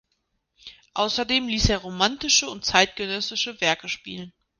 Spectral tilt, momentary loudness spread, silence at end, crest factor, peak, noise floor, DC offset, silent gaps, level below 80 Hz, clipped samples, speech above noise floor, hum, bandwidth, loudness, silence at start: -2 dB/octave; 12 LU; 0.3 s; 24 dB; 0 dBFS; -75 dBFS; under 0.1%; none; -40 dBFS; under 0.1%; 50 dB; none; 10.5 kHz; -22 LUFS; 0.65 s